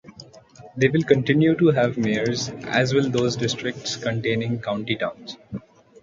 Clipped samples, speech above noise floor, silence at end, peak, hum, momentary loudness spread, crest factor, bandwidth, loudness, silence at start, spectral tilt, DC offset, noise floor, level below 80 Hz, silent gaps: under 0.1%; 25 dB; 0.45 s; -2 dBFS; none; 17 LU; 20 dB; 7.6 kHz; -22 LUFS; 0.05 s; -5.5 dB/octave; under 0.1%; -46 dBFS; -56 dBFS; none